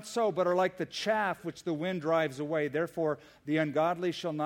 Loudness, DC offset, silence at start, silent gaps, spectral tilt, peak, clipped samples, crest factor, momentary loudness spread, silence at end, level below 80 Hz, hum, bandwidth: -31 LUFS; under 0.1%; 0 s; none; -5.5 dB/octave; -14 dBFS; under 0.1%; 16 dB; 6 LU; 0 s; -72 dBFS; none; 17 kHz